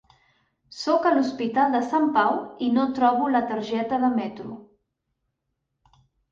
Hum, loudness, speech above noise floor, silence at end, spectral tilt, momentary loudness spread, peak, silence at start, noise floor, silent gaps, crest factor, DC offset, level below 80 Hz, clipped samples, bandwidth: none; -23 LUFS; 56 dB; 1.7 s; -5.5 dB/octave; 13 LU; -6 dBFS; 0.75 s; -79 dBFS; none; 18 dB; under 0.1%; -66 dBFS; under 0.1%; 7.6 kHz